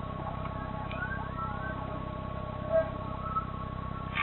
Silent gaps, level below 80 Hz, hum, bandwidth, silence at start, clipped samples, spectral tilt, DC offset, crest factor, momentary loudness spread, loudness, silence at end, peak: none; -44 dBFS; none; 4.2 kHz; 0 s; under 0.1%; -9.5 dB/octave; under 0.1%; 18 dB; 8 LU; -35 LUFS; 0 s; -16 dBFS